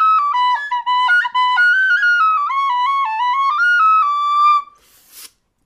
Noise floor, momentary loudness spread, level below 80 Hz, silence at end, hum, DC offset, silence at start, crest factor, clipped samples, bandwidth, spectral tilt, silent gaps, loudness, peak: -47 dBFS; 5 LU; -70 dBFS; 0.4 s; none; under 0.1%; 0 s; 8 dB; under 0.1%; 15.5 kHz; 3.5 dB/octave; none; -14 LUFS; -6 dBFS